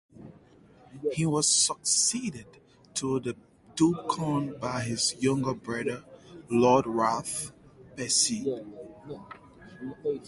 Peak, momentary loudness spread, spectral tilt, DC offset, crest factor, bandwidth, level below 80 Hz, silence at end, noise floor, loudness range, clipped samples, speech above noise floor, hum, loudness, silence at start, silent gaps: -10 dBFS; 21 LU; -3.5 dB/octave; under 0.1%; 20 dB; 11.5 kHz; -62 dBFS; 0 s; -56 dBFS; 3 LU; under 0.1%; 28 dB; none; -27 LUFS; 0.15 s; none